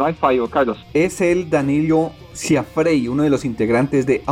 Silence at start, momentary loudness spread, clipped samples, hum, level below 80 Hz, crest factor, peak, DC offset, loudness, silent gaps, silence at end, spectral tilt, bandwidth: 0 s; 3 LU; under 0.1%; none; -46 dBFS; 14 dB; -4 dBFS; under 0.1%; -18 LUFS; none; 0 s; -6 dB/octave; 15.5 kHz